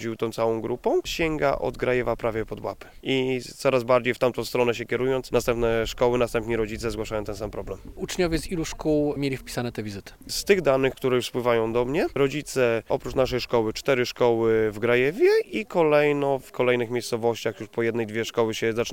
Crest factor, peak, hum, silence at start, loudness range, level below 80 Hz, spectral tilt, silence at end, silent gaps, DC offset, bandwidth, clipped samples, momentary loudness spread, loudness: 18 dB; -6 dBFS; none; 0 s; 5 LU; -44 dBFS; -5 dB/octave; 0 s; none; 0.2%; 17 kHz; under 0.1%; 9 LU; -25 LUFS